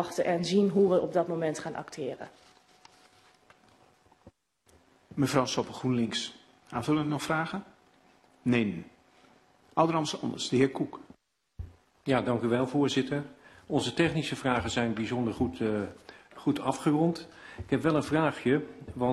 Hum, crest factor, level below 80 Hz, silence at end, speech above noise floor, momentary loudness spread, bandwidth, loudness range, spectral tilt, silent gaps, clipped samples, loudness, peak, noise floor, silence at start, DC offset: none; 20 dB; -58 dBFS; 0 s; 36 dB; 14 LU; 13 kHz; 6 LU; -5.5 dB/octave; none; under 0.1%; -29 LUFS; -10 dBFS; -65 dBFS; 0 s; under 0.1%